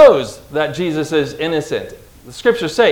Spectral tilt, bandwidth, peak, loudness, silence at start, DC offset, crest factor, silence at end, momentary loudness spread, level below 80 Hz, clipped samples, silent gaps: -5 dB/octave; 17 kHz; 0 dBFS; -17 LUFS; 0 s; under 0.1%; 14 dB; 0 s; 10 LU; -48 dBFS; 0.8%; none